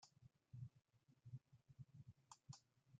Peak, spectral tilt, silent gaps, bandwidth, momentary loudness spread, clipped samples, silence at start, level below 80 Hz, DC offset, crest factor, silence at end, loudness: -44 dBFS; -5 dB/octave; none; 8.8 kHz; 6 LU; under 0.1%; 0 s; -86 dBFS; under 0.1%; 20 dB; 0 s; -64 LUFS